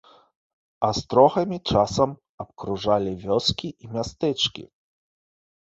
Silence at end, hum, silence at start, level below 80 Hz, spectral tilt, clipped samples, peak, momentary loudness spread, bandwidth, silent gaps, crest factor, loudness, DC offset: 1.1 s; none; 0.8 s; -50 dBFS; -5 dB/octave; under 0.1%; -4 dBFS; 14 LU; 8 kHz; 2.29-2.38 s; 22 dB; -23 LUFS; under 0.1%